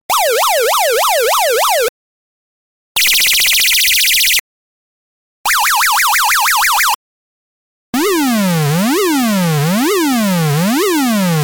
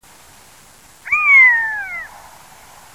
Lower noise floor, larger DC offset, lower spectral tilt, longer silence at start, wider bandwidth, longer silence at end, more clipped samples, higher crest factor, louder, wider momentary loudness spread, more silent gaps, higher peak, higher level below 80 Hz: first, under -90 dBFS vs -46 dBFS; second, under 0.1% vs 0.2%; first, -3 dB/octave vs -0.5 dB/octave; second, 0.1 s vs 1.05 s; first, over 20 kHz vs 16 kHz; second, 0 s vs 0.85 s; neither; about the same, 14 dB vs 16 dB; about the same, -11 LUFS vs -11 LUFS; second, 6 LU vs 21 LU; first, 1.89-2.95 s, 4.40-5.44 s, 6.95-7.93 s vs none; about the same, 0 dBFS vs -2 dBFS; first, -50 dBFS vs -58 dBFS